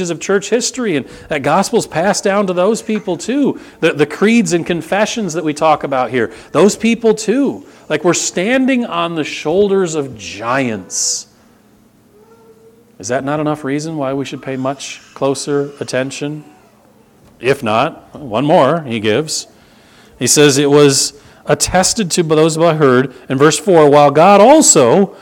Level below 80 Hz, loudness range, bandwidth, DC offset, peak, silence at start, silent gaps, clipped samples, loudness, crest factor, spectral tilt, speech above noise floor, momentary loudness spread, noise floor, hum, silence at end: -48 dBFS; 9 LU; 18 kHz; under 0.1%; 0 dBFS; 0 s; none; 0.1%; -13 LUFS; 14 dB; -4 dB/octave; 35 dB; 12 LU; -48 dBFS; none; 0.05 s